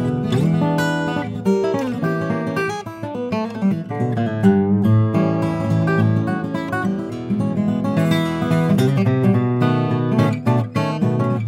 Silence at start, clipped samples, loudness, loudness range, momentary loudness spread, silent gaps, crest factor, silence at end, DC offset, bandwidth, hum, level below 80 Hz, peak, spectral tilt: 0 s; under 0.1%; -19 LUFS; 3 LU; 7 LU; none; 16 dB; 0 s; under 0.1%; 15.5 kHz; none; -54 dBFS; -2 dBFS; -8 dB/octave